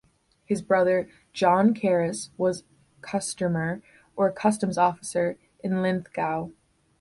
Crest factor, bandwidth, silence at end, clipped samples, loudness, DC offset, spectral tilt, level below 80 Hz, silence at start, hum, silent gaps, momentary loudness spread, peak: 18 dB; 11.5 kHz; 0.5 s; under 0.1%; -25 LUFS; under 0.1%; -5.5 dB/octave; -64 dBFS; 0.5 s; none; none; 13 LU; -8 dBFS